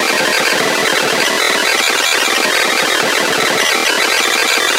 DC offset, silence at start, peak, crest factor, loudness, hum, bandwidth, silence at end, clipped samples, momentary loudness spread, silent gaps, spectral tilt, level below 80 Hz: under 0.1%; 0 s; 0 dBFS; 14 dB; -12 LUFS; none; 16 kHz; 0 s; under 0.1%; 1 LU; none; -0.5 dB/octave; -54 dBFS